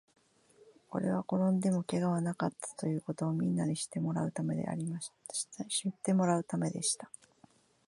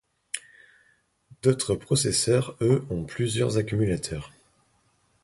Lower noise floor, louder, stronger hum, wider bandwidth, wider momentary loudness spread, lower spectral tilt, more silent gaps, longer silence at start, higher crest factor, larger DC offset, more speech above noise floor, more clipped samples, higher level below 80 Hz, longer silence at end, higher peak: about the same, -65 dBFS vs -67 dBFS; second, -34 LUFS vs -26 LUFS; neither; about the same, 11.5 kHz vs 11.5 kHz; second, 8 LU vs 14 LU; about the same, -5.5 dB/octave vs -5 dB/octave; neither; first, 0.65 s vs 0.35 s; about the same, 18 dB vs 20 dB; neither; second, 32 dB vs 42 dB; neither; second, -74 dBFS vs -50 dBFS; second, 0.8 s vs 0.95 s; second, -16 dBFS vs -6 dBFS